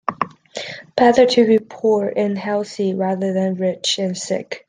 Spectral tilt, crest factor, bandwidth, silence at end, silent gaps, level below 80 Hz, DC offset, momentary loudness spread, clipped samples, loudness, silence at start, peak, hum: -5 dB/octave; 16 dB; 10 kHz; 0.1 s; none; -60 dBFS; under 0.1%; 13 LU; under 0.1%; -18 LUFS; 0.1 s; -2 dBFS; none